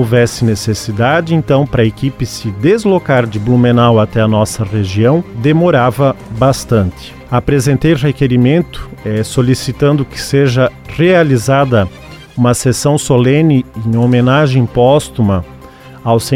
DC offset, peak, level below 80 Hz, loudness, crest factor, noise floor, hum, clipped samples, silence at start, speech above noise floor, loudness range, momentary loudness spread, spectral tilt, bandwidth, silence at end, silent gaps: under 0.1%; 0 dBFS; -34 dBFS; -12 LUFS; 12 dB; -34 dBFS; none; under 0.1%; 0 s; 23 dB; 2 LU; 8 LU; -6.5 dB/octave; 15.5 kHz; 0 s; none